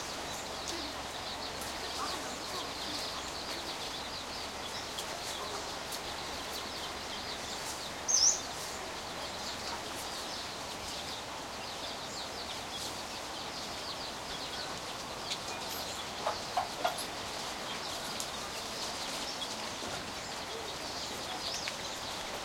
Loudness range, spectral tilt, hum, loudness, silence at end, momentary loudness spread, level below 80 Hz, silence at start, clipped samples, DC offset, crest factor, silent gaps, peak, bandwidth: 6 LU; -1 dB/octave; none; -36 LUFS; 0 s; 4 LU; -60 dBFS; 0 s; under 0.1%; under 0.1%; 24 dB; none; -14 dBFS; 16.5 kHz